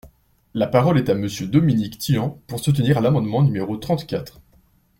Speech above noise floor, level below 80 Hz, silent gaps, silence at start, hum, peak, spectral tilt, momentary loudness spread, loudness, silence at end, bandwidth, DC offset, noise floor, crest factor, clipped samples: 38 dB; -50 dBFS; none; 0.05 s; none; -2 dBFS; -7 dB/octave; 10 LU; -20 LUFS; 0.7 s; 16.5 kHz; under 0.1%; -57 dBFS; 18 dB; under 0.1%